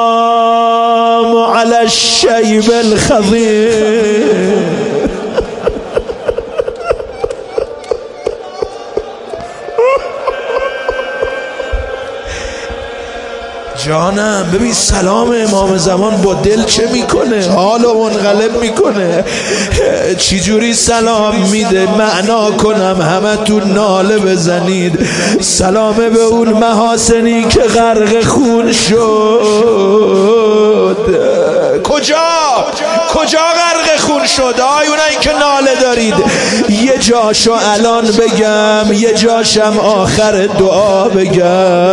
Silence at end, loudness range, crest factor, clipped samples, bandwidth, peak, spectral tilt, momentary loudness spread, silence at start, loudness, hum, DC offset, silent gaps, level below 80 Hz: 0 s; 8 LU; 10 dB; under 0.1%; 11.5 kHz; 0 dBFS; -4 dB/octave; 10 LU; 0 s; -10 LUFS; none; under 0.1%; none; -32 dBFS